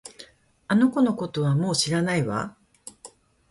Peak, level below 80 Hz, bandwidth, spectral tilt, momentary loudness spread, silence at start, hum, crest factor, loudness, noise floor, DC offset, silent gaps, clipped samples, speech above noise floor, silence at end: -8 dBFS; -60 dBFS; 11.5 kHz; -5 dB/octave; 22 LU; 0.05 s; none; 16 dB; -23 LUFS; -50 dBFS; under 0.1%; none; under 0.1%; 28 dB; 0.45 s